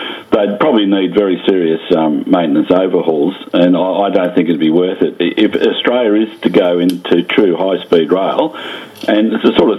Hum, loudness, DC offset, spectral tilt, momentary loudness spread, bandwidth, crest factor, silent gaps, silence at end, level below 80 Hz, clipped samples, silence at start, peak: none; -13 LUFS; under 0.1%; -7 dB/octave; 4 LU; 12 kHz; 12 dB; none; 0 s; -54 dBFS; 0.1%; 0 s; 0 dBFS